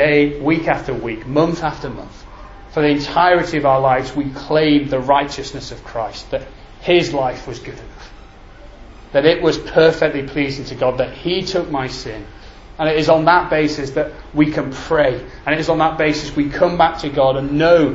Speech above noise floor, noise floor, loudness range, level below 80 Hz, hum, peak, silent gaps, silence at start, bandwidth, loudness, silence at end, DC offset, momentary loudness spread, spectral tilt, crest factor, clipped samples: 22 dB; -39 dBFS; 4 LU; -38 dBFS; none; 0 dBFS; none; 0 s; 8 kHz; -17 LUFS; 0 s; under 0.1%; 13 LU; -6 dB/octave; 18 dB; under 0.1%